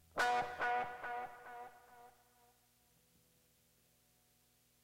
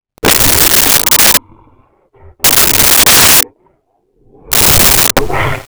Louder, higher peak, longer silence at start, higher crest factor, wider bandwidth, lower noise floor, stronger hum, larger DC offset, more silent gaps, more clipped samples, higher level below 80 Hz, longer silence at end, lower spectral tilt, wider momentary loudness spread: second, -39 LUFS vs -5 LUFS; second, -26 dBFS vs 0 dBFS; about the same, 0.15 s vs 0.25 s; first, 18 dB vs 10 dB; second, 16 kHz vs over 20 kHz; first, -74 dBFS vs -57 dBFS; first, 60 Hz at -80 dBFS vs none; neither; neither; neither; second, -76 dBFS vs -28 dBFS; first, 2.75 s vs 0.05 s; about the same, -2 dB/octave vs -1 dB/octave; first, 19 LU vs 8 LU